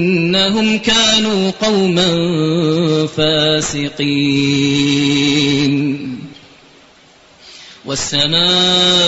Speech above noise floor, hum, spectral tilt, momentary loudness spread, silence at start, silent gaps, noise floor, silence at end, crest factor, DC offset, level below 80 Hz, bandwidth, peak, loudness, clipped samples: 32 dB; none; -4 dB/octave; 9 LU; 0 s; none; -46 dBFS; 0 s; 14 dB; under 0.1%; -46 dBFS; 8.2 kHz; 0 dBFS; -13 LUFS; under 0.1%